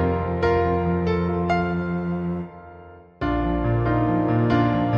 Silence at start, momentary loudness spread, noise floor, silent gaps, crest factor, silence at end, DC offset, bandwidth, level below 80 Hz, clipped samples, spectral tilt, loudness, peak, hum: 0 s; 9 LU; -44 dBFS; none; 16 dB; 0 s; under 0.1%; 6.8 kHz; -36 dBFS; under 0.1%; -9.5 dB/octave; -23 LUFS; -6 dBFS; none